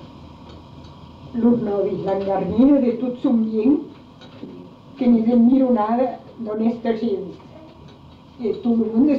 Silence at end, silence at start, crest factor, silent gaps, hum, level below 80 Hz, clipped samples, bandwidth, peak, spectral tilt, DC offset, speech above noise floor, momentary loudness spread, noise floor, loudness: 0 s; 0 s; 14 dB; none; none; -52 dBFS; under 0.1%; 5.2 kHz; -6 dBFS; -9.5 dB/octave; under 0.1%; 26 dB; 23 LU; -44 dBFS; -19 LUFS